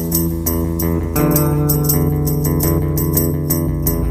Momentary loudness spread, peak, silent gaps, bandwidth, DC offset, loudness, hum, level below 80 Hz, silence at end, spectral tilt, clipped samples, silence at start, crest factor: 4 LU; 0 dBFS; none; 15.5 kHz; under 0.1%; -16 LUFS; none; -26 dBFS; 0 s; -6.5 dB/octave; under 0.1%; 0 s; 16 dB